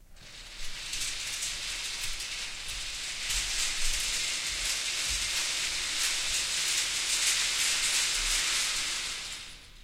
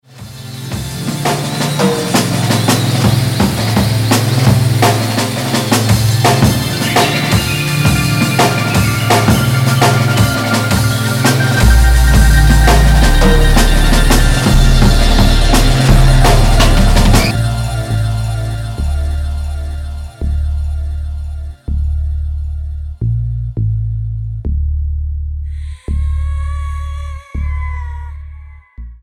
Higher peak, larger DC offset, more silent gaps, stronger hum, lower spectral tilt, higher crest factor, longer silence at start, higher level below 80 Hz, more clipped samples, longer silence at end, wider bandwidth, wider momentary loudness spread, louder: second, -14 dBFS vs 0 dBFS; neither; neither; neither; second, 1.5 dB/octave vs -5 dB/octave; first, 18 dB vs 12 dB; second, 0 s vs 0.15 s; second, -44 dBFS vs -16 dBFS; neither; about the same, 0 s vs 0.05 s; about the same, 16 kHz vs 17 kHz; second, 10 LU vs 13 LU; second, -28 LUFS vs -13 LUFS